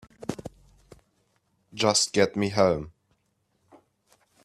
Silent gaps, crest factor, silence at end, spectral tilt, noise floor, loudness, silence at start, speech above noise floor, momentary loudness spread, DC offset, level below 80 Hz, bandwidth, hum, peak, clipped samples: none; 24 dB; 1.55 s; -3.5 dB/octave; -73 dBFS; -25 LUFS; 0.2 s; 49 dB; 23 LU; under 0.1%; -58 dBFS; 14 kHz; none; -6 dBFS; under 0.1%